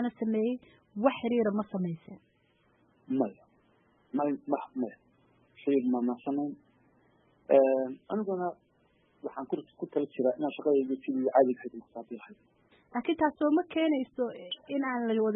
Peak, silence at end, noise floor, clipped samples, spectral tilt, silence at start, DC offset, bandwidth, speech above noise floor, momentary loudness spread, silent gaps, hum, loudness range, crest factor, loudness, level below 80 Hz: -10 dBFS; 0 s; -69 dBFS; under 0.1%; -10 dB/octave; 0 s; under 0.1%; 3.9 kHz; 39 dB; 15 LU; none; none; 5 LU; 22 dB; -31 LUFS; -76 dBFS